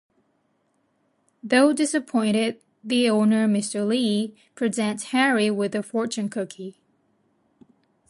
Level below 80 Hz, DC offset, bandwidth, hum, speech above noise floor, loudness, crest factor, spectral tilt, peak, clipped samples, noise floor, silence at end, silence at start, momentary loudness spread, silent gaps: -74 dBFS; under 0.1%; 11.5 kHz; none; 47 dB; -23 LUFS; 18 dB; -4.5 dB/octave; -6 dBFS; under 0.1%; -69 dBFS; 1.4 s; 1.45 s; 13 LU; none